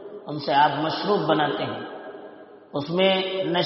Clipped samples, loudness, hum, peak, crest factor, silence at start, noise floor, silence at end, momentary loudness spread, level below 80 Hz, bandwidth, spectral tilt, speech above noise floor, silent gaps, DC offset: under 0.1%; -23 LUFS; none; -6 dBFS; 18 dB; 0 s; -44 dBFS; 0 s; 18 LU; -68 dBFS; 6 kHz; -3 dB/octave; 22 dB; none; under 0.1%